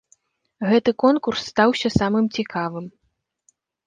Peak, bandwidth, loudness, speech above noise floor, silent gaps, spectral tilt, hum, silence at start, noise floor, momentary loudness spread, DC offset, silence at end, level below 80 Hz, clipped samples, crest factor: -2 dBFS; 9.4 kHz; -20 LUFS; 52 dB; none; -6 dB/octave; none; 0.6 s; -72 dBFS; 11 LU; under 0.1%; 0.95 s; -48 dBFS; under 0.1%; 20 dB